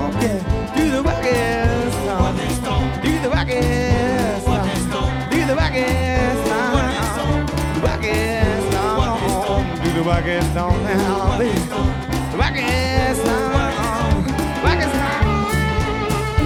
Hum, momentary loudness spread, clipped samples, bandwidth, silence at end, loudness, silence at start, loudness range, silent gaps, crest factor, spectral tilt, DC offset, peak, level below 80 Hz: none; 3 LU; under 0.1%; 16.5 kHz; 0 s; -19 LUFS; 0 s; 1 LU; none; 16 dB; -5.5 dB/octave; under 0.1%; -2 dBFS; -26 dBFS